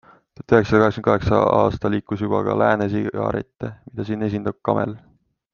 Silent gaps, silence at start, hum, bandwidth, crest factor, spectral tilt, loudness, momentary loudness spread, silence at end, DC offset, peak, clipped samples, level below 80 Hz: none; 0.5 s; none; 7 kHz; 20 dB; -8 dB/octave; -20 LUFS; 13 LU; 0.55 s; under 0.1%; -2 dBFS; under 0.1%; -46 dBFS